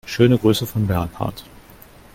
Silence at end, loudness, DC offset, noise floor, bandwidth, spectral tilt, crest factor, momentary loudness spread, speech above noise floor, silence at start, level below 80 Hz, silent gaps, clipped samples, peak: 0.7 s; -19 LUFS; under 0.1%; -45 dBFS; 17 kHz; -6.5 dB/octave; 20 dB; 13 LU; 27 dB; 0.05 s; -44 dBFS; none; under 0.1%; -2 dBFS